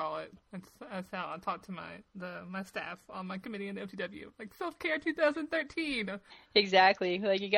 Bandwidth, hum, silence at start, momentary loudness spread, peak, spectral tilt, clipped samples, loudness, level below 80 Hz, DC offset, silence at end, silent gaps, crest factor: 16 kHz; none; 0 s; 19 LU; -10 dBFS; -5 dB/octave; under 0.1%; -33 LUFS; -70 dBFS; under 0.1%; 0 s; none; 24 dB